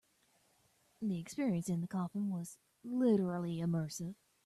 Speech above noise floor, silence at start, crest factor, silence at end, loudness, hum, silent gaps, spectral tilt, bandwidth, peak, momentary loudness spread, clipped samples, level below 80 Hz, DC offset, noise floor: 37 dB; 1 s; 16 dB; 0.3 s; -37 LUFS; none; none; -7 dB/octave; 13.5 kHz; -20 dBFS; 12 LU; under 0.1%; -76 dBFS; under 0.1%; -73 dBFS